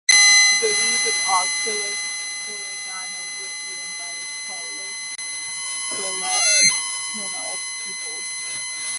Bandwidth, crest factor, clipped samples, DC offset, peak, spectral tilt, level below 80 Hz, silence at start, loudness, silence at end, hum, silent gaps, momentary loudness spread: 11.5 kHz; 22 dB; under 0.1%; under 0.1%; 0 dBFS; 2.5 dB/octave; -74 dBFS; 0.1 s; -20 LUFS; 0 s; none; none; 14 LU